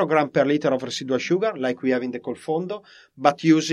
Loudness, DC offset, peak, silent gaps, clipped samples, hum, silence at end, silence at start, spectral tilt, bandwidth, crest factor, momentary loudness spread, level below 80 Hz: -23 LUFS; under 0.1%; -2 dBFS; none; under 0.1%; none; 0 s; 0 s; -5.5 dB/octave; 11 kHz; 20 dB; 10 LU; -70 dBFS